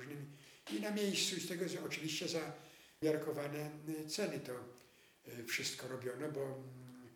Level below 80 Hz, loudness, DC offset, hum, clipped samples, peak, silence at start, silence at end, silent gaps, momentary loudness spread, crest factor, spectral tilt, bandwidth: -82 dBFS; -41 LUFS; under 0.1%; none; under 0.1%; -24 dBFS; 0 s; 0 s; none; 17 LU; 18 dB; -3.5 dB/octave; over 20 kHz